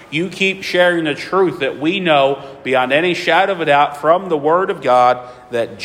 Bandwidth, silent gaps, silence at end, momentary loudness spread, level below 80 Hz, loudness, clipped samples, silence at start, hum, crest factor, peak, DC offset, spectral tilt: 15.5 kHz; none; 0 s; 7 LU; -58 dBFS; -15 LUFS; under 0.1%; 0 s; none; 14 dB; 0 dBFS; under 0.1%; -5 dB/octave